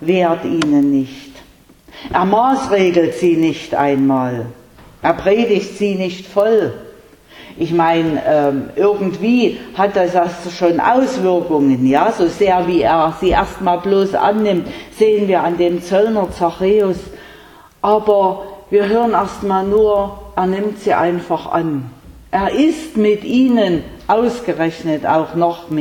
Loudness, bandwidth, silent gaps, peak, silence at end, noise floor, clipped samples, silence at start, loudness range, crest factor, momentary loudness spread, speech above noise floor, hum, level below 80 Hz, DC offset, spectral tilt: -15 LUFS; 18 kHz; none; 0 dBFS; 0 s; -45 dBFS; under 0.1%; 0 s; 3 LU; 14 dB; 7 LU; 30 dB; none; -42 dBFS; under 0.1%; -6.5 dB/octave